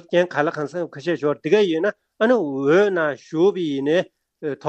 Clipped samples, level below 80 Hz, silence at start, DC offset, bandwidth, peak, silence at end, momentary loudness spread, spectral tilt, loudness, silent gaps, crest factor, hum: under 0.1%; -70 dBFS; 0.1 s; under 0.1%; 8.2 kHz; -4 dBFS; 0 s; 10 LU; -6.5 dB/octave; -21 LUFS; none; 16 dB; none